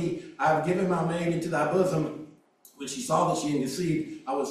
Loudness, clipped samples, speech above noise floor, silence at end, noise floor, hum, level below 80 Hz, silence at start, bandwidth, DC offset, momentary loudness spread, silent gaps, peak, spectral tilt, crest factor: -27 LUFS; under 0.1%; 30 dB; 0 s; -57 dBFS; none; -64 dBFS; 0 s; 14.5 kHz; under 0.1%; 10 LU; none; -10 dBFS; -5.5 dB/octave; 18 dB